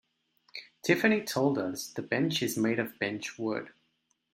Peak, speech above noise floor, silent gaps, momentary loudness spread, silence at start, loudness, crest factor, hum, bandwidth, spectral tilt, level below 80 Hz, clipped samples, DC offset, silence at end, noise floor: -10 dBFS; 46 dB; none; 16 LU; 0.55 s; -30 LUFS; 22 dB; none; 16.5 kHz; -4.5 dB/octave; -74 dBFS; under 0.1%; under 0.1%; 0.65 s; -76 dBFS